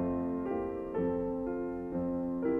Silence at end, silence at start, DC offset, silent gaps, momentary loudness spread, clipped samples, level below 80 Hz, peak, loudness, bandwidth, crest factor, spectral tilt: 0 s; 0 s; under 0.1%; none; 3 LU; under 0.1%; -54 dBFS; -20 dBFS; -35 LUFS; 3.3 kHz; 12 dB; -11 dB/octave